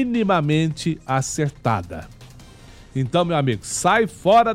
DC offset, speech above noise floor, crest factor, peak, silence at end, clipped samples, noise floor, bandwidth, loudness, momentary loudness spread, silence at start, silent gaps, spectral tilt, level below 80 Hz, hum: under 0.1%; 24 dB; 14 dB; -6 dBFS; 0 s; under 0.1%; -44 dBFS; 15.5 kHz; -21 LUFS; 9 LU; 0 s; none; -5 dB/octave; -48 dBFS; none